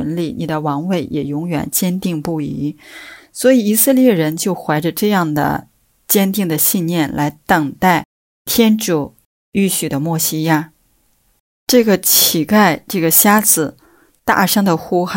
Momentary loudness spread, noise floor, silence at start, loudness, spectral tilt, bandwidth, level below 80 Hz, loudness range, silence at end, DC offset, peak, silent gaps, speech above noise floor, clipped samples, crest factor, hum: 12 LU; -59 dBFS; 0 s; -15 LUFS; -4 dB/octave; 16.5 kHz; -50 dBFS; 5 LU; 0 s; under 0.1%; 0 dBFS; 8.05-8.45 s, 9.25-9.52 s, 11.40-11.67 s; 44 dB; under 0.1%; 16 dB; none